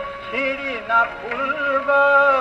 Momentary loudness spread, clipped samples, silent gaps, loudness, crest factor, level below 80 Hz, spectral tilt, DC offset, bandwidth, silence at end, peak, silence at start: 11 LU; under 0.1%; none; -19 LUFS; 16 dB; -52 dBFS; -4.5 dB/octave; under 0.1%; 7.8 kHz; 0 s; -4 dBFS; 0 s